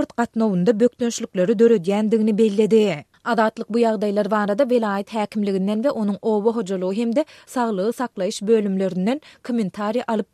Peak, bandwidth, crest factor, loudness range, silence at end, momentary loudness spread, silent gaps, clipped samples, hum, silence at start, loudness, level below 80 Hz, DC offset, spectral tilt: -4 dBFS; 13 kHz; 16 dB; 4 LU; 0.1 s; 8 LU; none; under 0.1%; none; 0 s; -21 LUFS; -68 dBFS; under 0.1%; -6.5 dB/octave